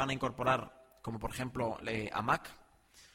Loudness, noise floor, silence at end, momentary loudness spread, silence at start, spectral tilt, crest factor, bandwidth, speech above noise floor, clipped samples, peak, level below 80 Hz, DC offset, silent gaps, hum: -36 LUFS; -62 dBFS; 0.1 s; 14 LU; 0 s; -5.5 dB/octave; 20 dB; 16.5 kHz; 27 dB; under 0.1%; -16 dBFS; -56 dBFS; under 0.1%; none; none